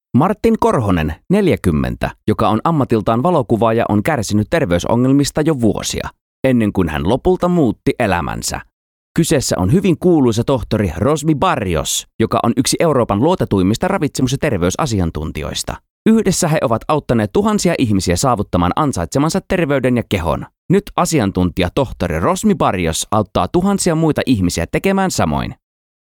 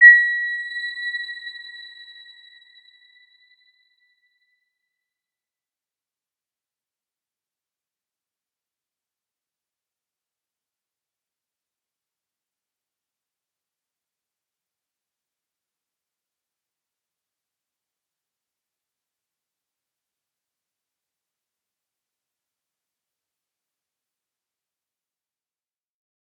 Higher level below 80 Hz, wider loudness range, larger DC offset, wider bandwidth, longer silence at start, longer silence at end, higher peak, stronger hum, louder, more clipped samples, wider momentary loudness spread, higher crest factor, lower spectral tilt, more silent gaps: first, -34 dBFS vs under -90 dBFS; second, 2 LU vs 25 LU; neither; first, 18.5 kHz vs 8.4 kHz; first, 0.15 s vs 0 s; second, 0.5 s vs 24.3 s; about the same, -2 dBFS vs -2 dBFS; neither; about the same, -16 LUFS vs -18 LUFS; neither; second, 5 LU vs 26 LU; second, 14 dB vs 28 dB; first, -5.5 dB/octave vs 5.5 dB/octave; first, 6.21-6.43 s, 8.73-9.15 s, 12.14-12.19 s, 15.90-16.05 s, 20.58-20.69 s vs none